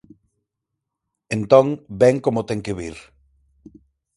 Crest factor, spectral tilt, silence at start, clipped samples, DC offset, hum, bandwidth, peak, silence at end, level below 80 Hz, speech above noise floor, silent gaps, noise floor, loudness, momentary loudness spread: 22 dB; -7 dB/octave; 1.3 s; under 0.1%; under 0.1%; none; 11.5 kHz; 0 dBFS; 1.15 s; -52 dBFS; 63 dB; none; -81 dBFS; -19 LUFS; 14 LU